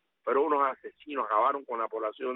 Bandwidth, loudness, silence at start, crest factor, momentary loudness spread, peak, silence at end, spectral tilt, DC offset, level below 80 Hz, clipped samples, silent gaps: 4 kHz; -29 LUFS; 0.25 s; 16 dB; 9 LU; -14 dBFS; 0 s; -1.5 dB/octave; under 0.1%; -82 dBFS; under 0.1%; none